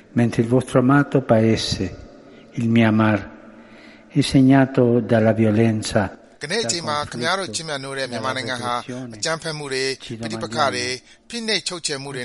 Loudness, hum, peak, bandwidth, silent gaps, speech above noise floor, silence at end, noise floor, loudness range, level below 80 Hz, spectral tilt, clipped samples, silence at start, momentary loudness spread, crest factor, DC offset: -20 LUFS; none; -2 dBFS; 11.5 kHz; none; 25 dB; 0 s; -45 dBFS; 6 LU; -50 dBFS; -5.5 dB/octave; under 0.1%; 0.15 s; 12 LU; 18 dB; under 0.1%